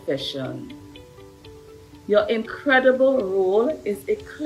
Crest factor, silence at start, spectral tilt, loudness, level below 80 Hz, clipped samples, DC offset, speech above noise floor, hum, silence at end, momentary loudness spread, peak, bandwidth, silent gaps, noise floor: 16 dB; 0.05 s; -5.5 dB/octave; -21 LUFS; -56 dBFS; under 0.1%; under 0.1%; 24 dB; none; 0 s; 19 LU; -6 dBFS; 13.5 kHz; none; -45 dBFS